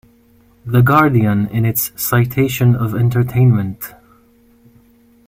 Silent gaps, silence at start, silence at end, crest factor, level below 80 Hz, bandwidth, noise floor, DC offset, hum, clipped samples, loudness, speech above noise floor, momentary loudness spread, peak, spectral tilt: none; 0.65 s; 1.4 s; 16 dB; -46 dBFS; 16.5 kHz; -51 dBFS; under 0.1%; none; under 0.1%; -15 LUFS; 37 dB; 10 LU; 0 dBFS; -6.5 dB/octave